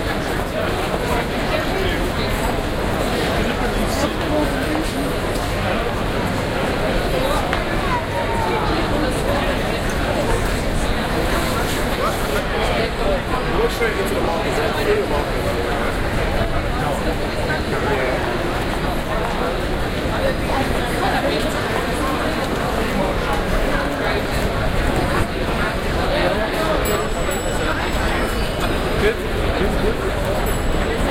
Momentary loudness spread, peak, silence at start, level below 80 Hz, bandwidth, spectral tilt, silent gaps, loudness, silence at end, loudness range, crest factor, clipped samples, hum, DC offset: 2 LU; -2 dBFS; 0 s; -26 dBFS; 16.5 kHz; -5 dB/octave; none; -20 LUFS; 0 s; 1 LU; 16 dB; under 0.1%; none; under 0.1%